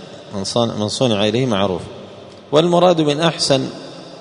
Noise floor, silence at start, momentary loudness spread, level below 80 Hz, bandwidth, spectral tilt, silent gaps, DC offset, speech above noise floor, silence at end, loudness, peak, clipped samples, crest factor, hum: -37 dBFS; 0 s; 20 LU; -54 dBFS; 11 kHz; -5 dB/octave; none; under 0.1%; 21 dB; 0 s; -17 LUFS; 0 dBFS; under 0.1%; 18 dB; none